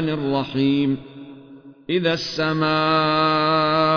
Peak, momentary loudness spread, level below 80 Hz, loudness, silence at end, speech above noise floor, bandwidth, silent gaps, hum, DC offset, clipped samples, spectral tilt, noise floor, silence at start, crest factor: -8 dBFS; 11 LU; -54 dBFS; -20 LUFS; 0 s; 24 dB; 5.4 kHz; none; none; under 0.1%; under 0.1%; -6.5 dB/octave; -44 dBFS; 0 s; 12 dB